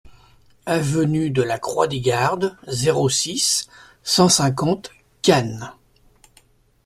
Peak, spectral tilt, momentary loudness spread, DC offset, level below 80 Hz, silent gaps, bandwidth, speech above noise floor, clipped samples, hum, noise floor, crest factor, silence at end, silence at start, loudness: -2 dBFS; -4 dB/octave; 16 LU; under 0.1%; -54 dBFS; none; 15 kHz; 37 dB; under 0.1%; none; -56 dBFS; 18 dB; 1.15 s; 0.05 s; -19 LUFS